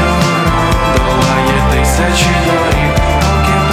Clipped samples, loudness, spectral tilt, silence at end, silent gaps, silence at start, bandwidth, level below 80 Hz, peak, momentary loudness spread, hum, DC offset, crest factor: under 0.1%; -11 LUFS; -5 dB/octave; 0 s; none; 0 s; 16 kHz; -18 dBFS; 0 dBFS; 1 LU; none; under 0.1%; 10 dB